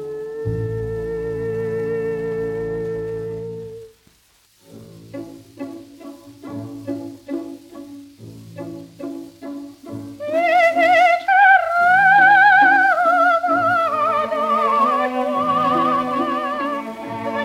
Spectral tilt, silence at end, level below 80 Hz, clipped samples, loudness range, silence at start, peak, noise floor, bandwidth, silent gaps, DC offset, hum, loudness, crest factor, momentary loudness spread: -5.5 dB/octave; 0 s; -50 dBFS; under 0.1%; 21 LU; 0 s; -2 dBFS; -56 dBFS; 16 kHz; none; under 0.1%; none; -17 LUFS; 16 dB; 23 LU